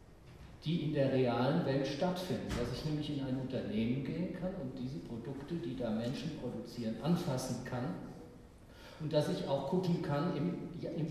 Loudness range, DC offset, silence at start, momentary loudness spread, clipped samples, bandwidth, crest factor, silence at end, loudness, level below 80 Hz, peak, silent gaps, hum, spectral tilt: 4 LU; under 0.1%; 0 s; 11 LU; under 0.1%; 13.5 kHz; 16 dB; 0 s; -37 LUFS; -58 dBFS; -20 dBFS; none; none; -7 dB/octave